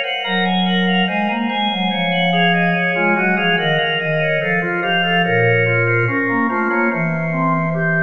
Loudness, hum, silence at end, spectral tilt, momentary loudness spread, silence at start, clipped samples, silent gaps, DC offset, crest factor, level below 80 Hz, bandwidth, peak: -16 LUFS; none; 0 s; -7.5 dB/octave; 4 LU; 0 s; under 0.1%; none; 0.9%; 14 dB; -58 dBFS; 6.2 kHz; -4 dBFS